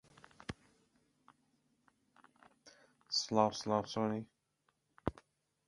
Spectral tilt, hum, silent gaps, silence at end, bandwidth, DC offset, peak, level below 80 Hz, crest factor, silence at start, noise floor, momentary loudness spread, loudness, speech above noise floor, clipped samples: -4.5 dB/octave; none; none; 0.55 s; 11.5 kHz; under 0.1%; -14 dBFS; -64 dBFS; 28 dB; 0.5 s; -81 dBFS; 18 LU; -37 LUFS; 46 dB; under 0.1%